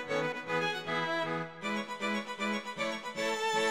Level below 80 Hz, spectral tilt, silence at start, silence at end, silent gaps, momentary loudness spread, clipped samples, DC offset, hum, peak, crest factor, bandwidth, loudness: -74 dBFS; -3.5 dB/octave; 0 s; 0 s; none; 4 LU; under 0.1%; 0.1%; none; -18 dBFS; 16 dB; 16 kHz; -34 LUFS